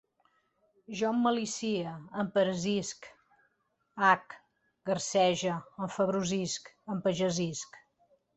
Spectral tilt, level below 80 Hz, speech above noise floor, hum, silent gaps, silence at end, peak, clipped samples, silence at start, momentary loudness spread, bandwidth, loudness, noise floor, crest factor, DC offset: -4.5 dB/octave; -70 dBFS; 46 dB; none; none; 0.6 s; -10 dBFS; under 0.1%; 0.9 s; 15 LU; 8.4 kHz; -31 LUFS; -77 dBFS; 22 dB; under 0.1%